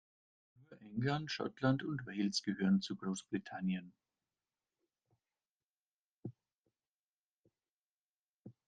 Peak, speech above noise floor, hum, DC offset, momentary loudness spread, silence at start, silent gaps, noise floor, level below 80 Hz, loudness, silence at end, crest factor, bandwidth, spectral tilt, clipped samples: -20 dBFS; over 53 dB; none; under 0.1%; 15 LU; 0.7 s; 5.51-5.56 s, 5.63-6.22 s, 6.58-6.63 s, 6.91-7.43 s, 7.70-8.45 s; under -90 dBFS; -76 dBFS; -38 LUFS; 0.15 s; 22 dB; 9 kHz; -5.5 dB/octave; under 0.1%